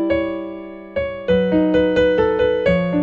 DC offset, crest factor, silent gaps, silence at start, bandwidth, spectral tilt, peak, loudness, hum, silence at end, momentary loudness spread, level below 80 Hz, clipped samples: under 0.1%; 12 dB; none; 0 s; 7 kHz; -8 dB/octave; -4 dBFS; -18 LUFS; none; 0 s; 12 LU; -38 dBFS; under 0.1%